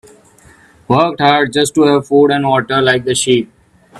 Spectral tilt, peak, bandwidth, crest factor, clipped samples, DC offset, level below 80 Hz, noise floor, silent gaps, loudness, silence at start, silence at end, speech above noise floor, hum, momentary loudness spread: -4.5 dB/octave; 0 dBFS; 13.5 kHz; 14 dB; under 0.1%; under 0.1%; -52 dBFS; -45 dBFS; none; -12 LUFS; 0.9 s; 0 s; 33 dB; none; 4 LU